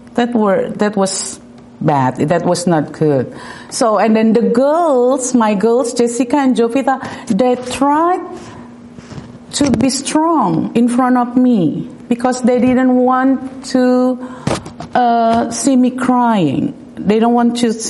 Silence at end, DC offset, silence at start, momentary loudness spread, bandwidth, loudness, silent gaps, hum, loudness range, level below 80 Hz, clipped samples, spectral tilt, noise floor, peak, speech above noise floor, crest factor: 0 s; under 0.1%; 0.05 s; 10 LU; 11.5 kHz; -14 LUFS; none; none; 3 LU; -50 dBFS; under 0.1%; -5.5 dB/octave; -34 dBFS; -2 dBFS; 21 dB; 12 dB